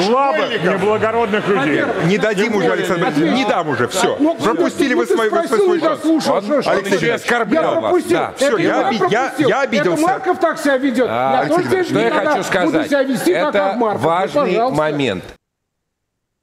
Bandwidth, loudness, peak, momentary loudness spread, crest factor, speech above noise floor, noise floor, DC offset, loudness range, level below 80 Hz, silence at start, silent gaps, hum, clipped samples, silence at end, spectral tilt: 15.5 kHz; -16 LUFS; -2 dBFS; 2 LU; 12 dB; 59 dB; -75 dBFS; under 0.1%; 0 LU; -54 dBFS; 0 s; none; none; under 0.1%; 1.1 s; -5 dB/octave